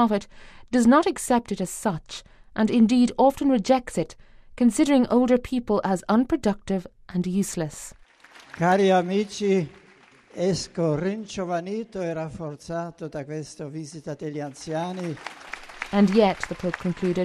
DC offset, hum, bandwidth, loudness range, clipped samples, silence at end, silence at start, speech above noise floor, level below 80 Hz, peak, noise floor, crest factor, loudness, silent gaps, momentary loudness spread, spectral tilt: under 0.1%; none; 14 kHz; 10 LU; under 0.1%; 0 s; 0 s; 31 dB; -52 dBFS; -6 dBFS; -54 dBFS; 18 dB; -24 LUFS; none; 16 LU; -6 dB/octave